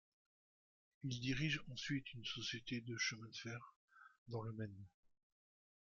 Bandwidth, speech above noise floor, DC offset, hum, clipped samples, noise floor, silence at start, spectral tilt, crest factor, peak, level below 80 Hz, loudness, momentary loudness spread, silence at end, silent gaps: 7.4 kHz; over 45 dB; under 0.1%; none; under 0.1%; under -90 dBFS; 1 s; -4 dB/octave; 20 dB; -28 dBFS; -70 dBFS; -45 LUFS; 14 LU; 1.05 s; 3.76-3.88 s, 4.18-4.26 s